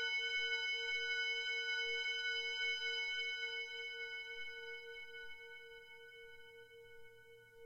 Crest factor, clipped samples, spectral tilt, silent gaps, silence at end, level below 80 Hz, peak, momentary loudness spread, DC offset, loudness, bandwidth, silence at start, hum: 16 dB; under 0.1%; 2 dB/octave; none; 0 s; -76 dBFS; -28 dBFS; 20 LU; under 0.1%; -39 LUFS; 16 kHz; 0 s; none